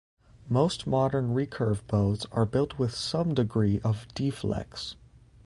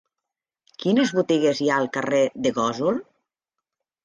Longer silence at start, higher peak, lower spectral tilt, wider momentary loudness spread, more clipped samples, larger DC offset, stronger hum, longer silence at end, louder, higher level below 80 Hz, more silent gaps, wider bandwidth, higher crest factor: second, 0.45 s vs 0.8 s; about the same, -10 dBFS vs -8 dBFS; first, -7 dB/octave vs -5 dB/octave; about the same, 6 LU vs 5 LU; neither; neither; neither; second, 0.5 s vs 1 s; second, -28 LUFS vs -22 LUFS; first, -50 dBFS vs -68 dBFS; neither; first, 11.5 kHz vs 9.8 kHz; about the same, 18 dB vs 16 dB